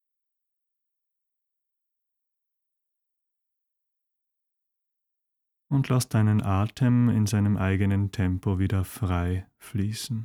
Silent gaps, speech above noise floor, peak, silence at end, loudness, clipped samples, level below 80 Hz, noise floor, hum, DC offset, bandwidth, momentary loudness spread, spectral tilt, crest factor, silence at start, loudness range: none; 59 dB; -10 dBFS; 0 s; -26 LUFS; under 0.1%; -52 dBFS; -83 dBFS; none; under 0.1%; 16.5 kHz; 8 LU; -7 dB/octave; 18 dB; 5.7 s; 7 LU